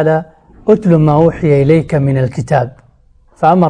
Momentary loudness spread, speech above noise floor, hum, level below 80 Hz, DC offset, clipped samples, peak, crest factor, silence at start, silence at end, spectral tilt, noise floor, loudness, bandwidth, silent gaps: 7 LU; 37 dB; none; -38 dBFS; under 0.1%; under 0.1%; 0 dBFS; 12 dB; 0 s; 0 s; -9 dB/octave; -47 dBFS; -12 LUFS; 9.8 kHz; none